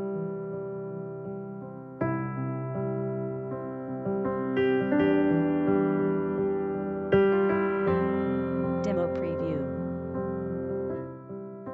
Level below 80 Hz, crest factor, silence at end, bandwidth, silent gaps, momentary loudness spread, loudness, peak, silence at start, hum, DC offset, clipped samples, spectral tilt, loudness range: -58 dBFS; 18 dB; 0 s; 6.2 kHz; none; 13 LU; -29 LUFS; -10 dBFS; 0 s; none; under 0.1%; under 0.1%; -9.5 dB/octave; 8 LU